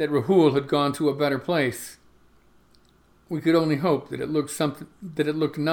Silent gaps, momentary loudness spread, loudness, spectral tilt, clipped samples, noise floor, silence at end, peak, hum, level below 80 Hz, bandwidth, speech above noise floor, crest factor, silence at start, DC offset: none; 13 LU; -24 LUFS; -6 dB/octave; under 0.1%; -59 dBFS; 0 s; -8 dBFS; none; -62 dBFS; 19 kHz; 35 dB; 16 dB; 0 s; under 0.1%